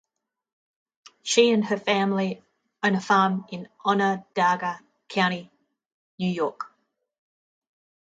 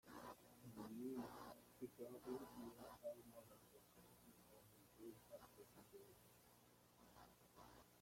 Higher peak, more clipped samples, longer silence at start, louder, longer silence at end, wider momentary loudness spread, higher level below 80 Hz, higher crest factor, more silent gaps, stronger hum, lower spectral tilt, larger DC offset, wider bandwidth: first, -4 dBFS vs -38 dBFS; neither; first, 1.25 s vs 0.05 s; first, -24 LUFS vs -59 LUFS; first, 1.35 s vs 0 s; about the same, 16 LU vs 14 LU; first, -74 dBFS vs -82 dBFS; about the same, 22 dB vs 22 dB; first, 5.94-6.18 s vs none; second, none vs 60 Hz at -75 dBFS; about the same, -4.5 dB/octave vs -5.5 dB/octave; neither; second, 9.2 kHz vs 16.5 kHz